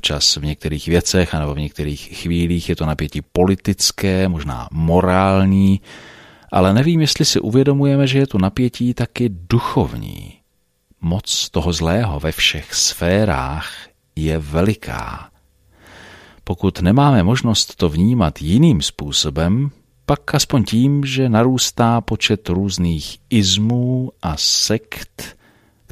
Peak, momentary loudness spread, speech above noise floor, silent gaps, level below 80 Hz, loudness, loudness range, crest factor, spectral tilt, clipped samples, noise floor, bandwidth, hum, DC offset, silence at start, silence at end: 0 dBFS; 11 LU; 47 dB; none; -34 dBFS; -17 LUFS; 5 LU; 16 dB; -5 dB/octave; under 0.1%; -64 dBFS; 15.5 kHz; none; under 0.1%; 0.05 s; 0.6 s